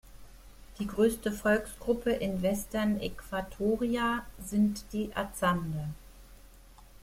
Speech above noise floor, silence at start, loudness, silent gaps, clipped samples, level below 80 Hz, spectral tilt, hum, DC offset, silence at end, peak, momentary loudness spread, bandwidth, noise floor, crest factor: 23 dB; 0.05 s; -31 LUFS; none; under 0.1%; -50 dBFS; -5.5 dB/octave; none; under 0.1%; 0 s; -14 dBFS; 9 LU; 16.5 kHz; -54 dBFS; 18 dB